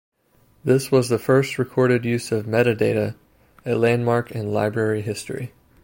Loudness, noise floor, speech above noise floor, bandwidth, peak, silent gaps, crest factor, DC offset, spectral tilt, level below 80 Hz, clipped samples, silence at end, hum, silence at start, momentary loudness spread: -21 LUFS; -59 dBFS; 39 dB; 16.5 kHz; -4 dBFS; none; 16 dB; under 0.1%; -6.5 dB/octave; -58 dBFS; under 0.1%; 0.35 s; none; 0.65 s; 11 LU